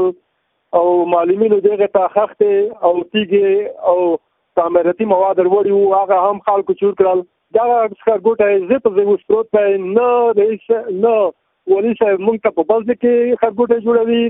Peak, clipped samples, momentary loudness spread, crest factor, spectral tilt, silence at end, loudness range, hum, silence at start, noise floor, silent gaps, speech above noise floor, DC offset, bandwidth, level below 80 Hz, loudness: 0 dBFS; under 0.1%; 4 LU; 14 dB; -11 dB/octave; 0 s; 1 LU; none; 0 s; -67 dBFS; none; 53 dB; under 0.1%; 3.9 kHz; -58 dBFS; -15 LUFS